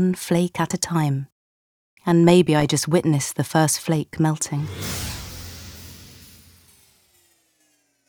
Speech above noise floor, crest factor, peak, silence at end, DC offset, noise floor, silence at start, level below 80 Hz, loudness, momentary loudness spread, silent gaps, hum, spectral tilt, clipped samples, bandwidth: 45 dB; 20 dB; -2 dBFS; 2.05 s; under 0.1%; -65 dBFS; 0 s; -50 dBFS; -21 LUFS; 22 LU; 1.32-1.97 s; none; -5.5 dB/octave; under 0.1%; over 20 kHz